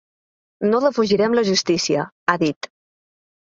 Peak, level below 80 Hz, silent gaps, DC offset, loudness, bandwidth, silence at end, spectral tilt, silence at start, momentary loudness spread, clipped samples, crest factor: -2 dBFS; -60 dBFS; 2.12-2.26 s, 2.56-2.61 s; under 0.1%; -19 LUFS; 7.8 kHz; 0.95 s; -4 dB/octave; 0.6 s; 7 LU; under 0.1%; 20 dB